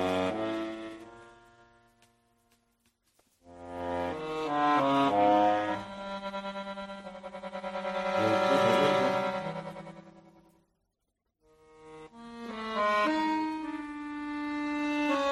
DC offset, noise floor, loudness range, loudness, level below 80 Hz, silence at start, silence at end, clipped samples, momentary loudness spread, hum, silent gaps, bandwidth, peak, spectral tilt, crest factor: under 0.1%; -82 dBFS; 14 LU; -30 LUFS; -66 dBFS; 0 s; 0 s; under 0.1%; 19 LU; none; none; 13 kHz; -12 dBFS; -5.5 dB/octave; 20 dB